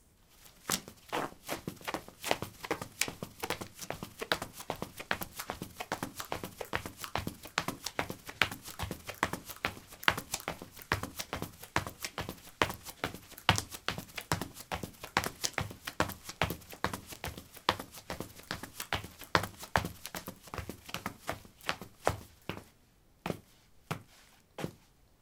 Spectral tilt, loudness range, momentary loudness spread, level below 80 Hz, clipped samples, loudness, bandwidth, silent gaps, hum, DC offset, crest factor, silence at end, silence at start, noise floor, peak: -3 dB/octave; 5 LU; 11 LU; -56 dBFS; under 0.1%; -37 LUFS; 18 kHz; none; none; under 0.1%; 36 dB; 0.45 s; 0.35 s; -65 dBFS; -2 dBFS